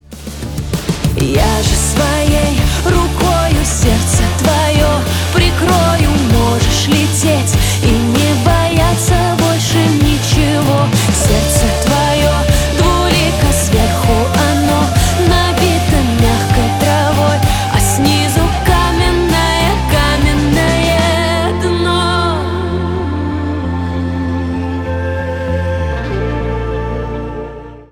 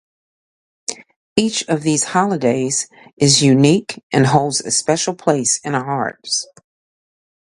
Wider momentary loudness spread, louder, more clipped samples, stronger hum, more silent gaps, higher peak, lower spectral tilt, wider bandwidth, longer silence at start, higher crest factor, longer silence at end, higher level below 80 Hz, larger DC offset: second, 7 LU vs 16 LU; first, -13 LUFS vs -16 LUFS; neither; neither; second, none vs 1.16-1.36 s, 3.13-3.17 s, 4.03-4.10 s; about the same, 0 dBFS vs 0 dBFS; about the same, -5 dB/octave vs -4 dB/octave; first, over 20 kHz vs 11.5 kHz; second, 0.1 s vs 0.9 s; second, 12 dB vs 18 dB; second, 0.1 s vs 0.95 s; first, -20 dBFS vs -56 dBFS; neither